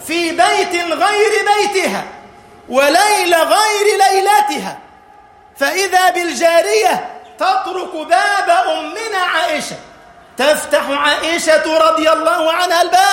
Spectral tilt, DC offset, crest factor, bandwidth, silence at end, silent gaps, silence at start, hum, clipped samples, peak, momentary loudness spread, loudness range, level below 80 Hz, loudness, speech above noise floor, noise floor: -1.5 dB/octave; under 0.1%; 14 dB; 16.5 kHz; 0 s; none; 0 s; none; under 0.1%; 0 dBFS; 9 LU; 3 LU; -56 dBFS; -13 LUFS; 30 dB; -43 dBFS